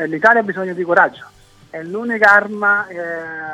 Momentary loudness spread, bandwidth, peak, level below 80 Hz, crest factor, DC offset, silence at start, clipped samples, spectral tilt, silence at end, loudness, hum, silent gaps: 15 LU; 14 kHz; 0 dBFS; -60 dBFS; 16 dB; under 0.1%; 0 s; under 0.1%; -6 dB/octave; 0 s; -15 LUFS; none; none